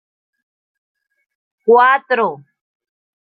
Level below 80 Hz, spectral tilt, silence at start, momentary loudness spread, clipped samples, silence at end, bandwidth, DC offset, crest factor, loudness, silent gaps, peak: -74 dBFS; -8 dB/octave; 1.65 s; 11 LU; under 0.1%; 1 s; 4.9 kHz; under 0.1%; 18 dB; -14 LUFS; none; -2 dBFS